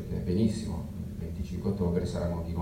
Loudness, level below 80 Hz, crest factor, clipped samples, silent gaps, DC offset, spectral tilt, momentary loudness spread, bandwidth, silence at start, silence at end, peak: -32 LUFS; -42 dBFS; 16 dB; under 0.1%; none; under 0.1%; -8 dB/octave; 9 LU; 16 kHz; 0 s; 0 s; -14 dBFS